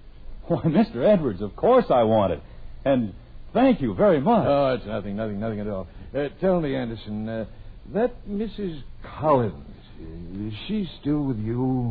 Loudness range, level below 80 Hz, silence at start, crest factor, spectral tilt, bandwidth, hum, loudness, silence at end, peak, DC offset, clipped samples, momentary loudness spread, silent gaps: 6 LU; -42 dBFS; 0 s; 16 dB; -11 dB/octave; 5 kHz; none; -24 LUFS; 0 s; -6 dBFS; under 0.1%; under 0.1%; 14 LU; none